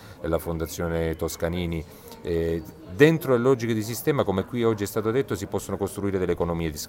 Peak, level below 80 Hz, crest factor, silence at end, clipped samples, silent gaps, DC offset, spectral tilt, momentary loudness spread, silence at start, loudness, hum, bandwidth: -4 dBFS; -44 dBFS; 22 dB; 0 s; under 0.1%; none; under 0.1%; -6 dB/octave; 10 LU; 0 s; -25 LUFS; none; 16.5 kHz